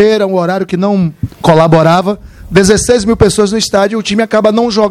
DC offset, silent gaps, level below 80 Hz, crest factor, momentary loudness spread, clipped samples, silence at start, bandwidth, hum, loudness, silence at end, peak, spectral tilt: under 0.1%; none; -32 dBFS; 10 dB; 7 LU; 0.6%; 0 s; 14 kHz; none; -10 LUFS; 0 s; 0 dBFS; -5 dB/octave